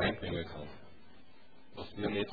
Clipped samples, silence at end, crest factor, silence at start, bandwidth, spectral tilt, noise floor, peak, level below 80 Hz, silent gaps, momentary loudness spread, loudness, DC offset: under 0.1%; 0 s; 20 dB; 0 s; 4.9 kHz; -4 dB/octave; -62 dBFS; -20 dBFS; -56 dBFS; none; 25 LU; -39 LUFS; 0.4%